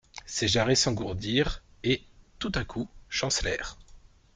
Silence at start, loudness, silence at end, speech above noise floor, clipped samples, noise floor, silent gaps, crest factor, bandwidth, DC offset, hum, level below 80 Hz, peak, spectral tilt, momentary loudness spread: 0.15 s; -28 LUFS; 0.35 s; 25 dB; under 0.1%; -53 dBFS; none; 20 dB; 10 kHz; under 0.1%; none; -44 dBFS; -10 dBFS; -3.5 dB/octave; 12 LU